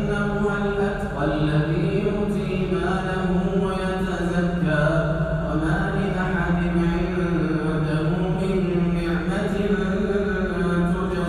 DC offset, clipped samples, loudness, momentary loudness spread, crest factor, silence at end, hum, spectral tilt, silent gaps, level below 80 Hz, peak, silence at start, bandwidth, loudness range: under 0.1%; under 0.1%; -23 LUFS; 3 LU; 12 dB; 0 s; none; -8 dB/octave; none; -34 dBFS; -8 dBFS; 0 s; 10.5 kHz; 1 LU